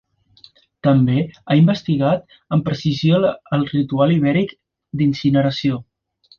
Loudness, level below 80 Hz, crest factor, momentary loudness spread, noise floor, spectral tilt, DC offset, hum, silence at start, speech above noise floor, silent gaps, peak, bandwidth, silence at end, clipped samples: -18 LUFS; -52 dBFS; 14 dB; 7 LU; -50 dBFS; -8.5 dB/octave; under 0.1%; none; 0.85 s; 34 dB; none; -4 dBFS; 7 kHz; 0.55 s; under 0.1%